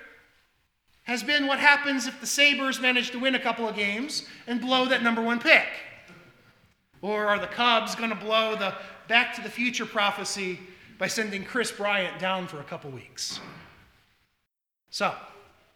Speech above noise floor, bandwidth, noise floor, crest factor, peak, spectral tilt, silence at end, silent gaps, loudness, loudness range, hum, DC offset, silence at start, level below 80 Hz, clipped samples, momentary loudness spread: 55 dB; 18 kHz; -82 dBFS; 26 dB; -2 dBFS; -2.5 dB/octave; 0.35 s; none; -25 LUFS; 8 LU; none; under 0.1%; 0 s; -70 dBFS; under 0.1%; 18 LU